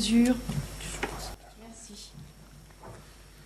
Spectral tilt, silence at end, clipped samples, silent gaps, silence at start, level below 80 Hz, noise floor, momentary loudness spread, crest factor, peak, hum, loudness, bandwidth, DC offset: -4.5 dB/octave; 0 s; under 0.1%; none; 0 s; -46 dBFS; -51 dBFS; 25 LU; 18 dB; -14 dBFS; none; -30 LUFS; 15 kHz; under 0.1%